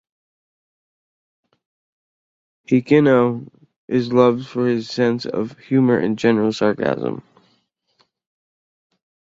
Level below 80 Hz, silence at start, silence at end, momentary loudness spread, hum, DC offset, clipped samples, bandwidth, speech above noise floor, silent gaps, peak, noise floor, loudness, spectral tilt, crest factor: -62 dBFS; 2.7 s; 2.2 s; 10 LU; none; under 0.1%; under 0.1%; 7.6 kHz; 48 dB; 3.76-3.88 s; -2 dBFS; -65 dBFS; -18 LUFS; -7.5 dB/octave; 18 dB